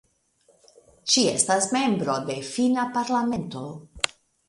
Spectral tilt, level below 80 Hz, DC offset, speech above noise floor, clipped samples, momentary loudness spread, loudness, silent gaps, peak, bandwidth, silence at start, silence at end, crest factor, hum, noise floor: -3 dB/octave; -60 dBFS; under 0.1%; 40 dB; under 0.1%; 13 LU; -24 LUFS; none; 0 dBFS; 11.5 kHz; 1.05 s; 0.4 s; 26 dB; none; -64 dBFS